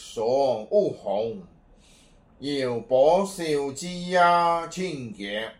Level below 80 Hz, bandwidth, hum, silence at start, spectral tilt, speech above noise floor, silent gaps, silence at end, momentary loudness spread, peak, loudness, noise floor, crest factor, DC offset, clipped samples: -58 dBFS; 15.5 kHz; none; 0 s; -4.5 dB/octave; 31 dB; none; 0.05 s; 13 LU; -8 dBFS; -24 LUFS; -55 dBFS; 18 dB; under 0.1%; under 0.1%